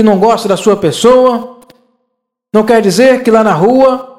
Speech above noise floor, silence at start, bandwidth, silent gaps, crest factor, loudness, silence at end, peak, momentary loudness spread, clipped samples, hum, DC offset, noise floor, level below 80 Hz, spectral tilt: 61 dB; 0 s; 15 kHz; none; 10 dB; -9 LUFS; 0.1 s; 0 dBFS; 5 LU; 0.9%; none; under 0.1%; -69 dBFS; -46 dBFS; -5.5 dB/octave